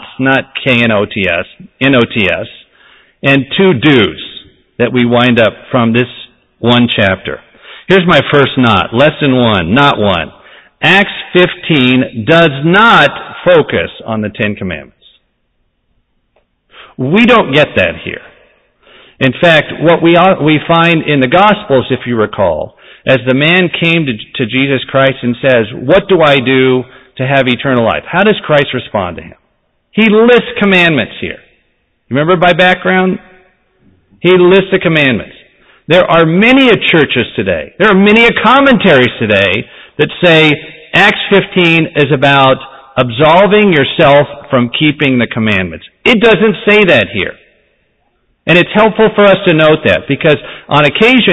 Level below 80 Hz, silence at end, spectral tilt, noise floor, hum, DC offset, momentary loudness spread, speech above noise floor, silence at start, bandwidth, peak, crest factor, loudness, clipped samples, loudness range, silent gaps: -40 dBFS; 0 s; -7 dB/octave; -60 dBFS; none; under 0.1%; 11 LU; 51 dB; 0 s; 8 kHz; 0 dBFS; 10 dB; -9 LUFS; 0.3%; 4 LU; none